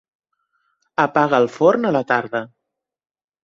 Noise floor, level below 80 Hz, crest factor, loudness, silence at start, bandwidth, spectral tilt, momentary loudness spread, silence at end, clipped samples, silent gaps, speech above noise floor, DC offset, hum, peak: -81 dBFS; -64 dBFS; 18 dB; -18 LUFS; 1 s; 7.6 kHz; -6.5 dB/octave; 12 LU; 0.95 s; under 0.1%; none; 64 dB; under 0.1%; none; -2 dBFS